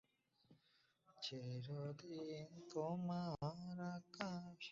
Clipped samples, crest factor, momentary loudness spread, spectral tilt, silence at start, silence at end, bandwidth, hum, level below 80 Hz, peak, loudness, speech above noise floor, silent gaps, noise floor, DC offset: under 0.1%; 24 dB; 7 LU; -5.5 dB/octave; 0.5 s; 0 s; 7.6 kHz; none; -80 dBFS; -26 dBFS; -49 LUFS; 31 dB; none; -79 dBFS; under 0.1%